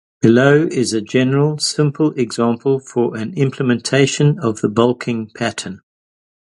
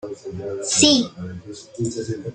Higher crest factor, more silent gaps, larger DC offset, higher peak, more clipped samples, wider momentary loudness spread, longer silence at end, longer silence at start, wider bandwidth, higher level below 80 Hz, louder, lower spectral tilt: second, 16 dB vs 22 dB; neither; neither; about the same, 0 dBFS vs 0 dBFS; neither; second, 9 LU vs 21 LU; first, 0.8 s vs 0 s; first, 0.25 s vs 0.05 s; first, 11.5 kHz vs 9.6 kHz; about the same, -58 dBFS vs -58 dBFS; first, -16 LUFS vs -19 LUFS; first, -5.5 dB/octave vs -3 dB/octave